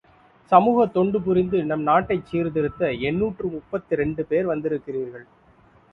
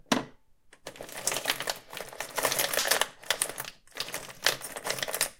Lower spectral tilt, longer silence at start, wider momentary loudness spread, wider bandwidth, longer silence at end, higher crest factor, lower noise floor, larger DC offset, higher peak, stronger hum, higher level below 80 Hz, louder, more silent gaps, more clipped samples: first, -9.5 dB/octave vs -0.5 dB/octave; first, 0.5 s vs 0.1 s; second, 11 LU vs 15 LU; second, 5 kHz vs 17 kHz; first, 0.7 s vs 0.05 s; second, 22 dB vs 30 dB; about the same, -55 dBFS vs -58 dBFS; neither; first, 0 dBFS vs -4 dBFS; neither; first, -50 dBFS vs -62 dBFS; first, -22 LUFS vs -30 LUFS; neither; neither